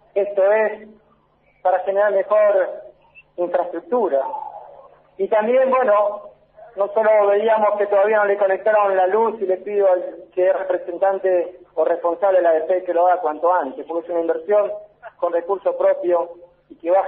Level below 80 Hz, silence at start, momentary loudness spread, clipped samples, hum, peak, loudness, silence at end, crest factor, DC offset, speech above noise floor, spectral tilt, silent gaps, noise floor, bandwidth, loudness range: -70 dBFS; 0.15 s; 11 LU; under 0.1%; none; -6 dBFS; -19 LUFS; 0 s; 14 dB; under 0.1%; 41 dB; -3 dB/octave; none; -59 dBFS; 3.9 kHz; 4 LU